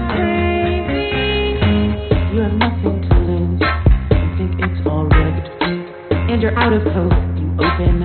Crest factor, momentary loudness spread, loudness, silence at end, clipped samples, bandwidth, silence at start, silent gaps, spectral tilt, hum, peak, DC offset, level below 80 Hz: 16 dB; 5 LU; -17 LUFS; 0 s; under 0.1%; 4.5 kHz; 0 s; none; -5.5 dB/octave; none; 0 dBFS; under 0.1%; -22 dBFS